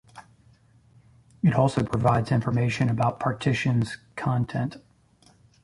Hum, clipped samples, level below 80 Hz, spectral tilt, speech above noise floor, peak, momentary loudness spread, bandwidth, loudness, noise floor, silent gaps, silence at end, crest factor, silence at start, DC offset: none; under 0.1%; -52 dBFS; -7.5 dB/octave; 35 dB; -6 dBFS; 8 LU; 11.5 kHz; -25 LUFS; -59 dBFS; none; 0.85 s; 20 dB; 0.15 s; under 0.1%